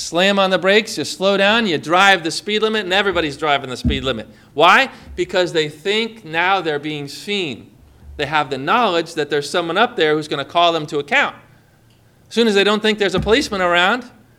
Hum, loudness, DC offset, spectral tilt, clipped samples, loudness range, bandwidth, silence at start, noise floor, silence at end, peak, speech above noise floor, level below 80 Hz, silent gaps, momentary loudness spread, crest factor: none; -17 LUFS; under 0.1%; -4 dB/octave; under 0.1%; 5 LU; 16 kHz; 0 s; -52 dBFS; 0.3 s; 0 dBFS; 34 dB; -40 dBFS; none; 10 LU; 18 dB